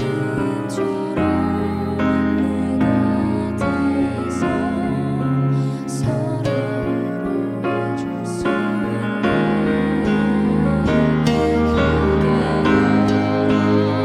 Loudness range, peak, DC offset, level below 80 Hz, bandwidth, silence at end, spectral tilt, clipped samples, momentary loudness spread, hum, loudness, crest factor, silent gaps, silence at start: 5 LU; -4 dBFS; under 0.1%; -36 dBFS; 12 kHz; 0 s; -7.5 dB/octave; under 0.1%; 6 LU; none; -19 LUFS; 14 dB; none; 0 s